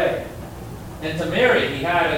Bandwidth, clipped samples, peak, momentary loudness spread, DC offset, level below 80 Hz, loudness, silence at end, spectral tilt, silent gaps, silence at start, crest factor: 17 kHz; under 0.1%; -6 dBFS; 18 LU; under 0.1%; -44 dBFS; -20 LUFS; 0 s; -5.5 dB/octave; none; 0 s; 16 dB